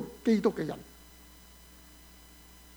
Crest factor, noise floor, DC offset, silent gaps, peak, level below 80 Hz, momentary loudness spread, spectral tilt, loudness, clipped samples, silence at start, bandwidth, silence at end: 20 dB; -54 dBFS; under 0.1%; none; -14 dBFS; -58 dBFS; 26 LU; -6.5 dB/octave; -30 LUFS; under 0.1%; 0 s; over 20 kHz; 1.9 s